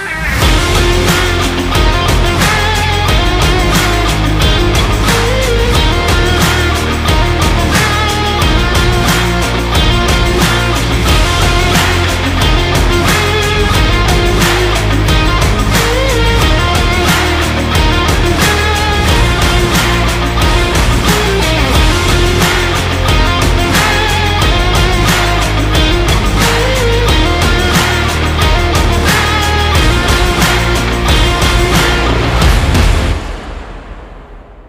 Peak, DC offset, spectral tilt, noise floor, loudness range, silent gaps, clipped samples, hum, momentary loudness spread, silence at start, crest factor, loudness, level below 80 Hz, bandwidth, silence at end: 0 dBFS; under 0.1%; -4 dB/octave; -32 dBFS; 0 LU; none; under 0.1%; none; 2 LU; 0 s; 10 dB; -11 LUFS; -16 dBFS; 16.5 kHz; 0 s